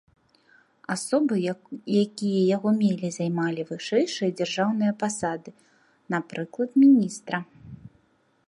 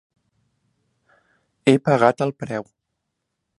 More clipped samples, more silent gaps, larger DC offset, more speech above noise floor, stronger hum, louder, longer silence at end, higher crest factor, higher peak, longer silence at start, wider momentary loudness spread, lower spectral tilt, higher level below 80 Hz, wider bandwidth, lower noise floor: neither; neither; neither; second, 41 dB vs 59 dB; neither; second, -25 LUFS vs -20 LUFS; second, 0.6 s vs 0.95 s; second, 16 dB vs 24 dB; second, -10 dBFS vs 0 dBFS; second, 0.9 s vs 1.65 s; about the same, 13 LU vs 13 LU; about the same, -5.5 dB/octave vs -6.5 dB/octave; about the same, -68 dBFS vs -66 dBFS; about the same, 11.5 kHz vs 11 kHz; second, -65 dBFS vs -78 dBFS